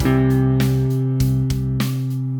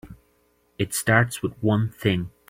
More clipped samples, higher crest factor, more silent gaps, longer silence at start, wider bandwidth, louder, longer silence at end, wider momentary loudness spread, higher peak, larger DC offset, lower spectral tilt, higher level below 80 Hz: neither; second, 12 dB vs 22 dB; neither; about the same, 0 s vs 0.05 s; first, 20 kHz vs 16 kHz; first, -19 LUFS vs -23 LUFS; second, 0 s vs 0.2 s; about the same, 5 LU vs 7 LU; second, -6 dBFS vs -2 dBFS; neither; first, -7.5 dB/octave vs -5 dB/octave; first, -34 dBFS vs -52 dBFS